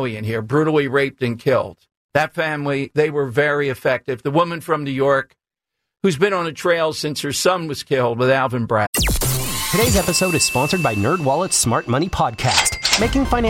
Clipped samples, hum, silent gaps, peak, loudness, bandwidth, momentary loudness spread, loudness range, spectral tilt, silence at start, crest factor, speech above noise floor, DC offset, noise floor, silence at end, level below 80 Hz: under 0.1%; none; 1.97-2.09 s, 8.87-8.93 s; -2 dBFS; -18 LUFS; 17 kHz; 6 LU; 3 LU; -4 dB/octave; 0 s; 16 dB; 63 dB; under 0.1%; -81 dBFS; 0 s; -34 dBFS